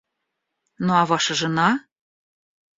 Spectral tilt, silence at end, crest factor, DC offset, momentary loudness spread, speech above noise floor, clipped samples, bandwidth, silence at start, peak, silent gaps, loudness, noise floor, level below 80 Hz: -4 dB/octave; 1 s; 20 dB; under 0.1%; 7 LU; 59 dB; under 0.1%; 7.8 kHz; 0.8 s; -4 dBFS; none; -21 LUFS; -79 dBFS; -64 dBFS